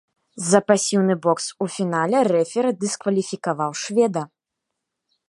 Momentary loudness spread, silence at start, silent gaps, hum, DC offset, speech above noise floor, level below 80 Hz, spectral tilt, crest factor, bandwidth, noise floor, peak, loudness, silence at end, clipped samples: 8 LU; 0.35 s; none; none; under 0.1%; 61 dB; -72 dBFS; -4.5 dB/octave; 20 dB; 11.5 kHz; -81 dBFS; -2 dBFS; -21 LUFS; 1 s; under 0.1%